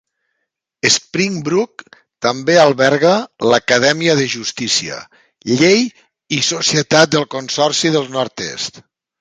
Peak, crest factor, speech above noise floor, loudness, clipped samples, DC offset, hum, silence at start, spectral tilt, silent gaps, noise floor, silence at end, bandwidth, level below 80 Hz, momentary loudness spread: 0 dBFS; 16 dB; 59 dB; -15 LUFS; under 0.1%; under 0.1%; none; 0.85 s; -3.5 dB/octave; none; -74 dBFS; 0.4 s; 10 kHz; -58 dBFS; 11 LU